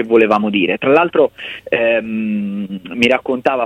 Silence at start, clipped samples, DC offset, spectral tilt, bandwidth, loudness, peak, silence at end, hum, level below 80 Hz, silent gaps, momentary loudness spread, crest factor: 0 s; under 0.1%; under 0.1%; -6 dB/octave; 9.6 kHz; -15 LUFS; 0 dBFS; 0 s; none; -56 dBFS; none; 10 LU; 16 dB